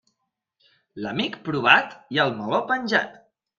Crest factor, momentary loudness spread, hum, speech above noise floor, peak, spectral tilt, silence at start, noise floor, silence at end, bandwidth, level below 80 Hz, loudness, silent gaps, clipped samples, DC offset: 24 dB; 12 LU; none; 56 dB; 0 dBFS; -5 dB/octave; 0.95 s; -79 dBFS; 0.4 s; 7.6 kHz; -66 dBFS; -22 LUFS; none; under 0.1%; under 0.1%